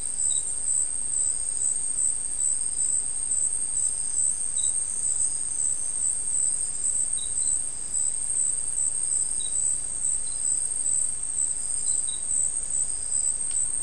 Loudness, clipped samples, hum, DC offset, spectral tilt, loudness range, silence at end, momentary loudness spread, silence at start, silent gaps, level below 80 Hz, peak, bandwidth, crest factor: -24 LUFS; under 0.1%; none; 2%; 0.5 dB/octave; 1 LU; 0 s; 2 LU; 0 s; none; -50 dBFS; -12 dBFS; 12 kHz; 14 dB